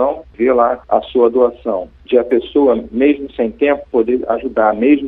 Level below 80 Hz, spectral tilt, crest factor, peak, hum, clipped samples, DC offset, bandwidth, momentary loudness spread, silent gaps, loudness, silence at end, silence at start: -44 dBFS; -9 dB/octave; 14 dB; 0 dBFS; none; under 0.1%; under 0.1%; 4.1 kHz; 6 LU; none; -15 LUFS; 0 s; 0 s